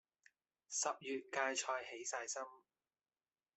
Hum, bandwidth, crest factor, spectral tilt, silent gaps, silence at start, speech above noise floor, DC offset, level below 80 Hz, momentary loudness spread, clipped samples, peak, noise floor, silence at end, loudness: none; 8.4 kHz; 22 dB; 0 dB/octave; none; 0.7 s; over 47 dB; under 0.1%; under -90 dBFS; 7 LU; under 0.1%; -22 dBFS; under -90 dBFS; 1 s; -42 LUFS